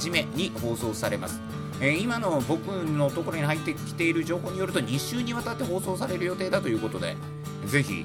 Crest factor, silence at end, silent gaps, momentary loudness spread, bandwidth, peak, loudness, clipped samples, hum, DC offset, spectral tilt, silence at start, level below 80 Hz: 22 dB; 0 s; none; 6 LU; 18 kHz; -6 dBFS; -28 LUFS; under 0.1%; none; under 0.1%; -5 dB/octave; 0 s; -56 dBFS